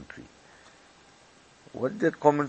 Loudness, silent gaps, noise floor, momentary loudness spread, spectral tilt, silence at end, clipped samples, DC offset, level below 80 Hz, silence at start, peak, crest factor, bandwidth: -27 LUFS; none; -57 dBFS; 24 LU; -7 dB/octave; 0 s; under 0.1%; under 0.1%; -66 dBFS; 0 s; -4 dBFS; 26 dB; 8.6 kHz